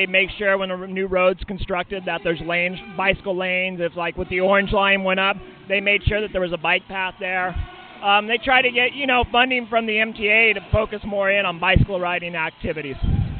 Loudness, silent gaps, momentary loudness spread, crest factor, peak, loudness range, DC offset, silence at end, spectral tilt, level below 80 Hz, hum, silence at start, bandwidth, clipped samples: -20 LUFS; none; 9 LU; 18 dB; -2 dBFS; 4 LU; under 0.1%; 0 s; -8.5 dB/octave; -36 dBFS; none; 0 s; 4.6 kHz; under 0.1%